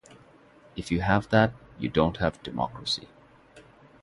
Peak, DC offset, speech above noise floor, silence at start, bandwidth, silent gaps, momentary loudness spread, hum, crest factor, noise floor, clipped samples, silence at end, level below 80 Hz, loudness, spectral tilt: -6 dBFS; under 0.1%; 29 dB; 0.75 s; 11.5 kHz; none; 11 LU; none; 22 dB; -55 dBFS; under 0.1%; 0.45 s; -48 dBFS; -27 LUFS; -6 dB/octave